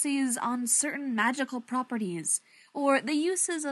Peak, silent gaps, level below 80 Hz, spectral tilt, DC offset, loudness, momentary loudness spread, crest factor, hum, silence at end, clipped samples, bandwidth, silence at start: -12 dBFS; none; -88 dBFS; -2.5 dB/octave; under 0.1%; -28 LUFS; 7 LU; 18 dB; none; 0 s; under 0.1%; 12.5 kHz; 0 s